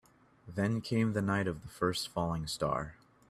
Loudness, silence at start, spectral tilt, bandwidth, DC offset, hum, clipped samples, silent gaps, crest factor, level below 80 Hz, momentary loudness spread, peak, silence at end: -34 LUFS; 0.45 s; -5.5 dB/octave; 15 kHz; under 0.1%; none; under 0.1%; none; 18 dB; -58 dBFS; 7 LU; -16 dBFS; 0.35 s